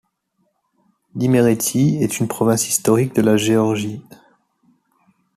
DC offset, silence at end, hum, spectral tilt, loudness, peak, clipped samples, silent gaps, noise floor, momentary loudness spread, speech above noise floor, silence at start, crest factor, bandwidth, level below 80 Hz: under 0.1%; 1.35 s; none; -5.5 dB/octave; -17 LUFS; -2 dBFS; under 0.1%; none; -68 dBFS; 9 LU; 51 dB; 1.15 s; 16 dB; 14.5 kHz; -58 dBFS